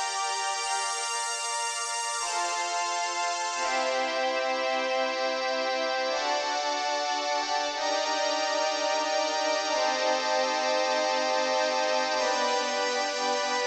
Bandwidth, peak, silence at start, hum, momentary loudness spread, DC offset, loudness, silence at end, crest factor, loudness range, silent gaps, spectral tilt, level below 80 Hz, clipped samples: 12.5 kHz; -14 dBFS; 0 s; 50 Hz at -80 dBFS; 3 LU; under 0.1%; -27 LUFS; 0 s; 14 dB; 2 LU; none; 1.5 dB/octave; -74 dBFS; under 0.1%